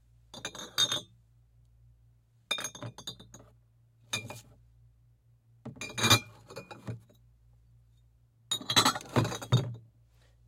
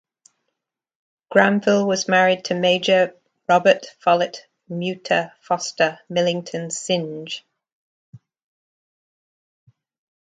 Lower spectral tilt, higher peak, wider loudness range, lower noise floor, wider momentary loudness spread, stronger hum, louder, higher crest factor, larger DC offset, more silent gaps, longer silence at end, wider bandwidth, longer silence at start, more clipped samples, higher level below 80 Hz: about the same, -3 dB/octave vs -4 dB/octave; second, -8 dBFS vs 0 dBFS; about the same, 10 LU vs 12 LU; second, -64 dBFS vs -80 dBFS; first, 24 LU vs 12 LU; neither; second, -30 LUFS vs -20 LUFS; first, 28 dB vs 22 dB; neither; second, none vs 7.72-8.13 s; second, 0.65 s vs 2.1 s; first, 16.5 kHz vs 9.4 kHz; second, 0.35 s vs 1.3 s; neither; first, -64 dBFS vs -70 dBFS